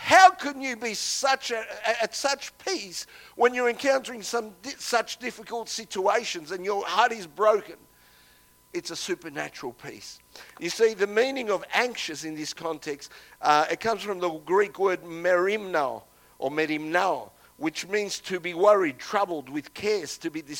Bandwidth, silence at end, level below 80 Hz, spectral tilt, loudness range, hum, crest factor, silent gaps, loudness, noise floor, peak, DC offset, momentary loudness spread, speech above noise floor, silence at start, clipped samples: 17.5 kHz; 0 s; -68 dBFS; -2.5 dB/octave; 3 LU; 60 Hz at -70 dBFS; 24 dB; none; -26 LUFS; -58 dBFS; -2 dBFS; under 0.1%; 13 LU; 31 dB; 0 s; under 0.1%